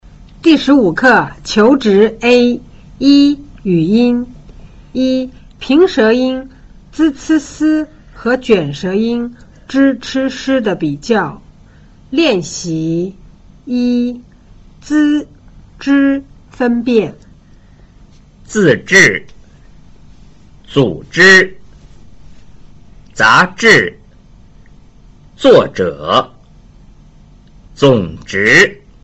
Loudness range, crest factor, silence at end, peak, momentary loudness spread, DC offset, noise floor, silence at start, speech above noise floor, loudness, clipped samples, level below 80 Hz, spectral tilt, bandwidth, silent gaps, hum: 6 LU; 14 dB; 0.3 s; 0 dBFS; 13 LU; under 0.1%; -42 dBFS; 0.45 s; 30 dB; -12 LUFS; under 0.1%; -42 dBFS; -5 dB/octave; 8.2 kHz; none; none